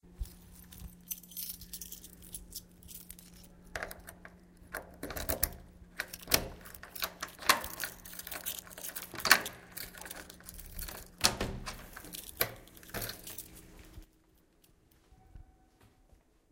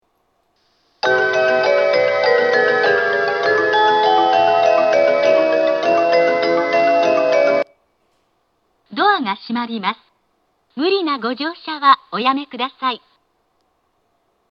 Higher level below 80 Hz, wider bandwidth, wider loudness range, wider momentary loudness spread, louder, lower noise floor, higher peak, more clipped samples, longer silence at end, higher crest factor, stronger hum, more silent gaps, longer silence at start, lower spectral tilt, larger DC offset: first, -52 dBFS vs -72 dBFS; first, 17 kHz vs 6.8 kHz; first, 14 LU vs 7 LU; first, 21 LU vs 9 LU; second, -36 LUFS vs -16 LUFS; about the same, -67 dBFS vs -65 dBFS; about the same, -2 dBFS vs 0 dBFS; neither; second, 0.65 s vs 1.55 s; first, 36 dB vs 16 dB; neither; neither; second, 0.05 s vs 1.05 s; second, -1.5 dB/octave vs -4 dB/octave; neither